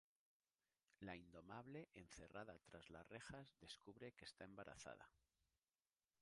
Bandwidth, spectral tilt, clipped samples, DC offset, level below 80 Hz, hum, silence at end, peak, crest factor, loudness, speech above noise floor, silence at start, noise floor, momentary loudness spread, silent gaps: 11 kHz; -4.5 dB/octave; under 0.1%; under 0.1%; -80 dBFS; none; 1.05 s; -38 dBFS; 24 dB; -60 LUFS; over 30 dB; 1 s; under -90 dBFS; 5 LU; none